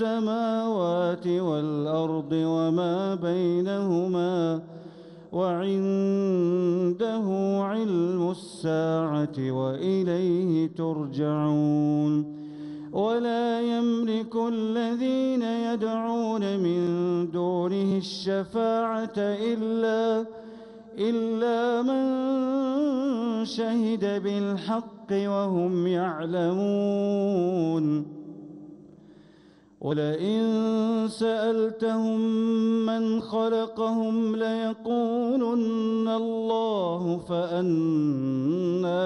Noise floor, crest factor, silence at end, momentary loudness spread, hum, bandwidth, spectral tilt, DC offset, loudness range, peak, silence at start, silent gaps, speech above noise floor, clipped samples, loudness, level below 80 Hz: -55 dBFS; 12 dB; 0 s; 5 LU; none; 10.5 kHz; -7.5 dB/octave; under 0.1%; 2 LU; -14 dBFS; 0 s; none; 30 dB; under 0.1%; -26 LUFS; -70 dBFS